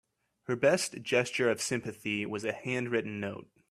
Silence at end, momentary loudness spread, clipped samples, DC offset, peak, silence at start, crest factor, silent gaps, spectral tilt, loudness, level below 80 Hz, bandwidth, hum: 0.25 s; 11 LU; under 0.1%; under 0.1%; -14 dBFS; 0.5 s; 18 dB; none; -4 dB/octave; -31 LUFS; -72 dBFS; 15 kHz; none